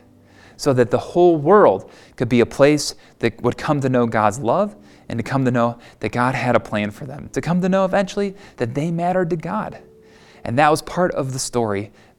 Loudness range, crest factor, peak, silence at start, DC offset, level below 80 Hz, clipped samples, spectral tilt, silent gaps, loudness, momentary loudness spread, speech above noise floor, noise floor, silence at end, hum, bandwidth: 5 LU; 20 dB; 0 dBFS; 0.6 s; under 0.1%; -48 dBFS; under 0.1%; -6 dB/octave; none; -19 LUFS; 12 LU; 29 dB; -48 dBFS; 0.3 s; none; 16 kHz